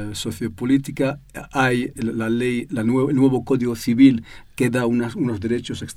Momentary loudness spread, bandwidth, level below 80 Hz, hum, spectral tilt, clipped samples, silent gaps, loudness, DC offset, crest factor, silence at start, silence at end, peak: 12 LU; 14.5 kHz; -48 dBFS; none; -6.5 dB/octave; under 0.1%; none; -21 LUFS; under 0.1%; 18 dB; 0 s; 0.05 s; -2 dBFS